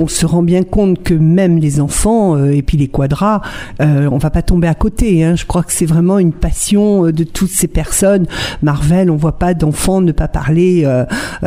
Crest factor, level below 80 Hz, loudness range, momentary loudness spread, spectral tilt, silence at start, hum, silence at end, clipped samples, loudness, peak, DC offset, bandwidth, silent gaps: 12 dB; -22 dBFS; 1 LU; 4 LU; -6 dB/octave; 0 s; none; 0 s; under 0.1%; -12 LUFS; 0 dBFS; under 0.1%; 16 kHz; none